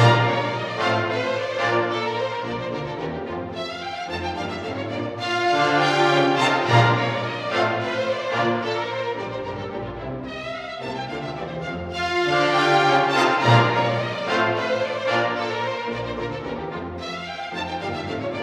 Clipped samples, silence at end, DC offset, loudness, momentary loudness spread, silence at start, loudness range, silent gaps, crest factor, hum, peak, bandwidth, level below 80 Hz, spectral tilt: under 0.1%; 0 s; under 0.1%; -23 LUFS; 13 LU; 0 s; 8 LU; none; 20 dB; none; -2 dBFS; 11 kHz; -52 dBFS; -5.5 dB/octave